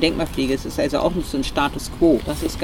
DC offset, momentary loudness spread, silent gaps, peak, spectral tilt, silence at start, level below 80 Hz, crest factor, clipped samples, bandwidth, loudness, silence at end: under 0.1%; 6 LU; none; -4 dBFS; -5 dB/octave; 0 s; -34 dBFS; 16 dB; under 0.1%; 18 kHz; -21 LUFS; 0 s